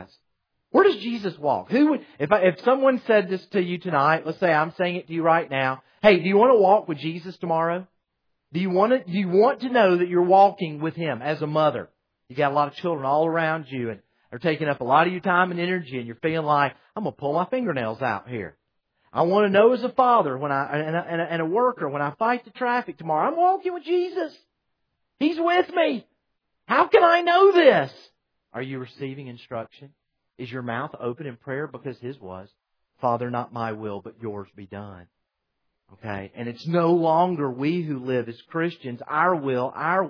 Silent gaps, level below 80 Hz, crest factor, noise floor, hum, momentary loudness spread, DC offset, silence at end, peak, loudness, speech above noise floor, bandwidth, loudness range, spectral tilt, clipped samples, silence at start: none; -68 dBFS; 20 dB; -78 dBFS; none; 17 LU; under 0.1%; 0 s; -4 dBFS; -22 LUFS; 56 dB; 5.4 kHz; 11 LU; -8 dB/octave; under 0.1%; 0 s